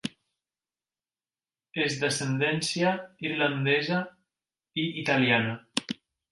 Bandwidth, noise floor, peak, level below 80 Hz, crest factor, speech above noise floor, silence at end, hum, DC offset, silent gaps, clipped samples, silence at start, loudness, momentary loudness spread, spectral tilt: 11.5 kHz; under -90 dBFS; -6 dBFS; -72 dBFS; 24 dB; over 63 dB; 0.4 s; none; under 0.1%; none; under 0.1%; 0.05 s; -27 LUFS; 13 LU; -4.5 dB/octave